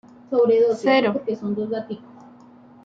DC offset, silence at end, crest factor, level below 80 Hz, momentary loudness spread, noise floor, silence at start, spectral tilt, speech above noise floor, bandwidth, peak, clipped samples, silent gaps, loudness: under 0.1%; 0.85 s; 14 dB; -68 dBFS; 13 LU; -48 dBFS; 0.3 s; -6.5 dB/octave; 28 dB; 7.8 kHz; -8 dBFS; under 0.1%; none; -21 LUFS